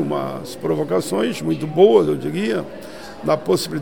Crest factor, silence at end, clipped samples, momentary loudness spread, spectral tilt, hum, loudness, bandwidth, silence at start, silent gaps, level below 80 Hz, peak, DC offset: 18 dB; 0 s; under 0.1%; 14 LU; -6 dB/octave; none; -19 LUFS; 17.5 kHz; 0 s; none; -54 dBFS; -2 dBFS; 0.7%